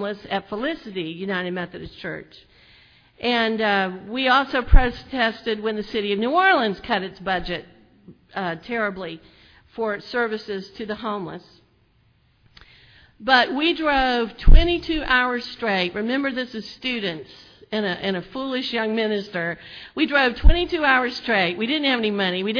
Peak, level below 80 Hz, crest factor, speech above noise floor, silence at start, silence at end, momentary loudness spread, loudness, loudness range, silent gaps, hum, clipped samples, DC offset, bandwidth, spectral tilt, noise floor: 0 dBFS; -26 dBFS; 22 dB; 40 dB; 0 s; 0 s; 14 LU; -22 LUFS; 8 LU; none; none; under 0.1%; under 0.1%; 5.4 kHz; -6.5 dB/octave; -61 dBFS